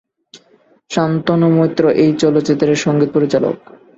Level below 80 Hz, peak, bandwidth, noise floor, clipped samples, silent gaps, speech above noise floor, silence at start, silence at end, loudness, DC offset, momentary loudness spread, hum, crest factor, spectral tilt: -54 dBFS; 0 dBFS; 8 kHz; -52 dBFS; under 0.1%; none; 39 dB; 0.35 s; 0.4 s; -14 LUFS; under 0.1%; 6 LU; none; 14 dB; -6.5 dB/octave